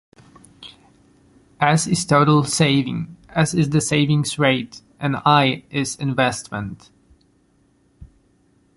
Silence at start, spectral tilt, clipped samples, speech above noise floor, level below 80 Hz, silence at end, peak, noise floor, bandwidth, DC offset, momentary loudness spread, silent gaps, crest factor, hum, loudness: 0.6 s; -5 dB/octave; under 0.1%; 41 dB; -52 dBFS; 0.7 s; -2 dBFS; -60 dBFS; 11.5 kHz; under 0.1%; 14 LU; none; 20 dB; none; -19 LUFS